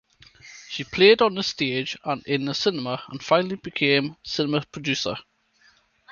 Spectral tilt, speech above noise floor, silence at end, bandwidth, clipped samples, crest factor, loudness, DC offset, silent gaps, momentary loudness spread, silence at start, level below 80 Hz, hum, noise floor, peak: -4.5 dB/octave; 37 dB; 0.9 s; 7.2 kHz; under 0.1%; 22 dB; -23 LUFS; under 0.1%; none; 14 LU; 0.45 s; -60 dBFS; none; -60 dBFS; -4 dBFS